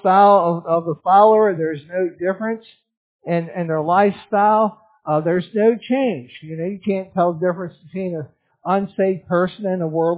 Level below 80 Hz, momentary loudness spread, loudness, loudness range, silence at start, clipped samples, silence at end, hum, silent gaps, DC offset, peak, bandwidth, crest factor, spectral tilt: -64 dBFS; 16 LU; -19 LUFS; 4 LU; 0.05 s; under 0.1%; 0 s; none; 2.97-3.19 s; under 0.1%; -2 dBFS; 4 kHz; 18 dB; -11 dB/octave